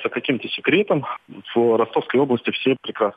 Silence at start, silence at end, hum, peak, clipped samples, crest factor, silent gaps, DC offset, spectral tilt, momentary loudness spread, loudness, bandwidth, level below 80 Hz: 0 s; 0.05 s; none; -6 dBFS; under 0.1%; 16 dB; none; under 0.1%; -8 dB/octave; 6 LU; -20 LUFS; 5 kHz; -68 dBFS